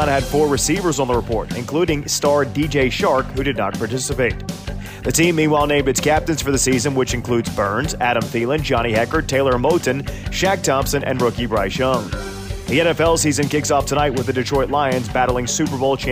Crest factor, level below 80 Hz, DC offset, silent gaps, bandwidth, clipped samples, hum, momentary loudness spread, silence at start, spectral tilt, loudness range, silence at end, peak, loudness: 14 dB; -34 dBFS; under 0.1%; none; 16 kHz; under 0.1%; none; 6 LU; 0 s; -4.5 dB/octave; 1 LU; 0 s; -4 dBFS; -18 LUFS